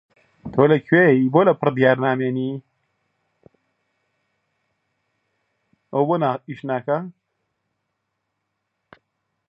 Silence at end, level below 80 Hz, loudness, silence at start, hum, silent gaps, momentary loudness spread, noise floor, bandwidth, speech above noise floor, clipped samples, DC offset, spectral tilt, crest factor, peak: 2.4 s; -64 dBFS; -19 LUFS; 0.45 s; none; none; 14 LU; -77 dBFS; 5.2 kHz; 59 dB; under 0.1%; under 0.1%; -10 dB/octave; 22 dB; -2 dBFS